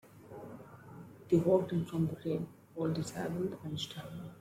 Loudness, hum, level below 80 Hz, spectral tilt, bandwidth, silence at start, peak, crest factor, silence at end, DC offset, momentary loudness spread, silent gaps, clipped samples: -35 LUFS; none; -68 dBFS; -7 dB/octave; 16 kHz; 0.05 s; -16 dBFS; 20 dB; 0 s; under 0.1%; 22 LU; none; under 0.1%